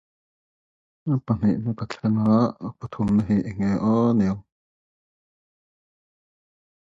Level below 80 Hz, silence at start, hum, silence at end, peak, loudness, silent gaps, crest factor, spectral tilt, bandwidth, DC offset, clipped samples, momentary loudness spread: -52 dBFS; 1.05 s; none; 2.45 s; -8 dBFS; -23 LUFS; none; 18 dB; -9 dB/octave; 7.6 kHz; under 0.1%; under 0.1%; 12 LU